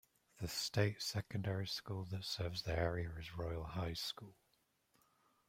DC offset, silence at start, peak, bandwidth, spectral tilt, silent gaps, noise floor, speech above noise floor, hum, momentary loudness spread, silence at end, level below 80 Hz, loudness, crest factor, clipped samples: under 0.1%; 0.35 s; -20 dBFS; 16 kHz; -4.5 dB/octave; none; -80 dBFS; 38 dB; none; 8 LU; 1.15 s; -60 dBFS; -42 LUFS; 22 dB; under 0.1%